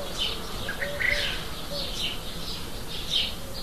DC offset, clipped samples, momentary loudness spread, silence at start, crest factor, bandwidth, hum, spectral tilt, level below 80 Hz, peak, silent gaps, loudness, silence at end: 1%; under 0.1%; 9 LU; 0 s; 18 dB; 14 kHz; none; -2.5 dB/octave; -40 dBFS; -12 dBFS; none; -29 LUFS; 0 s